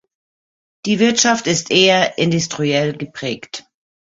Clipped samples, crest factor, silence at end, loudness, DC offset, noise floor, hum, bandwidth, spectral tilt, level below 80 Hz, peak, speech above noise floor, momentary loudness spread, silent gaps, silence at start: under 0.1%; 18 dB; 0.55 s; -16 LUFS; under 0.1%; under -90 dBFS; none; 8 kHz; -3.5 dB/octave; -58 dBFS; -2 dBFS; over 74 dB; 15 LU; none; 0.85 s